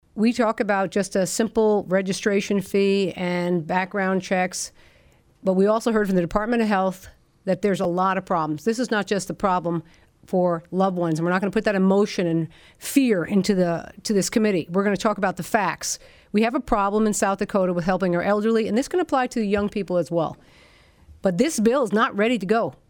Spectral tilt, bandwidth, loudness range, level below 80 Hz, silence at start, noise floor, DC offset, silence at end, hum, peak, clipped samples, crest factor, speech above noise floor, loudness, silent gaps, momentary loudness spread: -5.5 dB/octave; 19.5 kHz; 2 LU; -50 dBFS; 0.15 s; -56 dBFS; under 0.1%; 0.2 s; none; -6 dBFS; under 0.1%; 16 dB; 34 dB; -22 LUFS; none; 6 LU